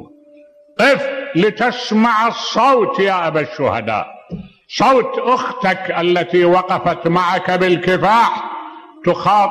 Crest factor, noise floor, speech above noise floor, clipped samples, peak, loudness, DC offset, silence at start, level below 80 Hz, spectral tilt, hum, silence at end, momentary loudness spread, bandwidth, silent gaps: 12 dB; -45 dBFS; 31 dB; under 0.1%; -4 dBFS; -15 LUFS; under 0.1%; 0 s; -54 dBFS; -5.5 dB/octave; none; 0 s; 12 LU; 13 kHz; none